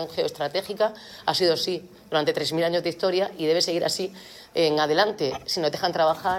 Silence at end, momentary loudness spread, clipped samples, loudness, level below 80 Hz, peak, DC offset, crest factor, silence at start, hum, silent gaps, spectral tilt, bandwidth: 0 s; 7 LU; under 0.1%; -24 LUFS; -64 dBFS; -6 dBFS; under 0.1%; 18 dB; 0 s; none; none; -3.5 dB/octave; 17 kHz